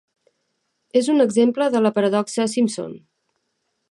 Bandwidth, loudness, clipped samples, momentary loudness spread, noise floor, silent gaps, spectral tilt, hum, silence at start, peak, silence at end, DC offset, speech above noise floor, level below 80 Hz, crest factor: 11.5 kHz; -19 LUFS; under 0.1%; 6 LU; -73 dBFS; none; -5 dB/octave; none; 0.95 s; -6 dBFS; 0.95 s; under 0.1%; 55 dB; -70 dBFS; 16 dB